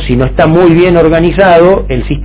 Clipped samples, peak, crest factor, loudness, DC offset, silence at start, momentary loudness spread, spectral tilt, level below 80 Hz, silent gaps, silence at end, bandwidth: 5%; 0 dBFS; 6 dB; -7 LUFS; under 0.1%; 0 s; 6 LU; -11.5 dB/octave; -20 dBFS; none; 0 s; 4 kHz